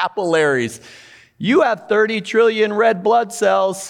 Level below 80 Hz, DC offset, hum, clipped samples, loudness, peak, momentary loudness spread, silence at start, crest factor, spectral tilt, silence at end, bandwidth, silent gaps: -68 dBFS; under 0.1%; none; under 0.1%; -17 LUFS; -4 dBFS; 6 LU; 0 s; 12 dB; -4.5 dB/octave; 0 s; 13.5 kHz; none